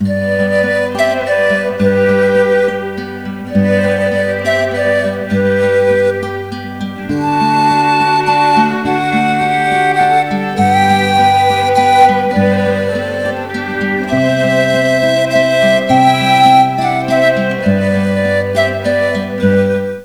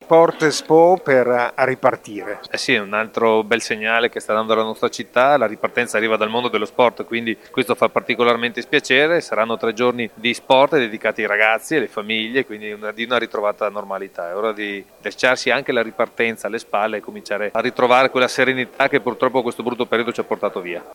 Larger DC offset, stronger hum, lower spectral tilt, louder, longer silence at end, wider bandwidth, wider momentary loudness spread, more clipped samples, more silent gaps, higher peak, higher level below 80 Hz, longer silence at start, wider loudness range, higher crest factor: first, 0.4% vs under 0.1%; neither; first, -5.5 dB/octave vs -4 dB/octave; first, -12 LUFS vs -18 LUFS; about the same, 0 s vs 0 s; first, over 20 kHz vs 17 kHz; about the same, 8 LU vs 10 LU; neither; neither; about the same, 0 dBFS vs 0 dBFS; first, -48 dBFS vs -66 dBFS; about the same, 0 s vs 0 s; about the same, 3 LU vs 4 LU; second, 12 dB vs 18 dB